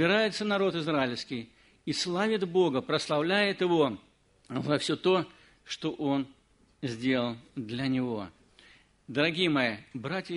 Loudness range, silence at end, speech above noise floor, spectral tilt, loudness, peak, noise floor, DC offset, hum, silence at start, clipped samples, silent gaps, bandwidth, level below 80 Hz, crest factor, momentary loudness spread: 5 LU; 0 s; 30 dB; -5 dB/octave; -29 LUFS; -12 dBFS; -59 dBFS; under 0.1%; none; 0 s; under 0.1%; none; 10.5 kHz; -68 dBFS; 18 dB; 13 LU